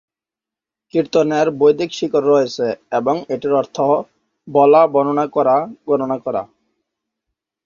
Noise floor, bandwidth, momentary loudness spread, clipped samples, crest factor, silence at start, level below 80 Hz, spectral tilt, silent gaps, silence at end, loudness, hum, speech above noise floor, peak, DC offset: -88 dBFS; 7.2 kHz; 9 LU; under 0.1%; 16 dB; 0.95 s; -62 dBFS; -6 dB/octave; none; 1.2 s; -17 LUFS; none; 72 dB; -2 dBFS; under 0.1%